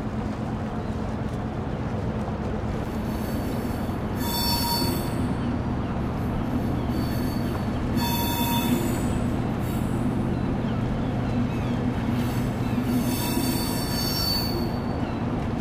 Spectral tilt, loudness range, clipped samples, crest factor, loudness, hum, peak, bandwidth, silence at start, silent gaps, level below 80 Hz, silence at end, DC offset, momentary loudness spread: -5.5 dB/octave; 4 LU; under 0.1%; 16 dB; -26 LUFS; none; -10 dBFS; 16 kHz; 0 s; none; -36 dBFS; 0 s; under 0.1%; 6 LU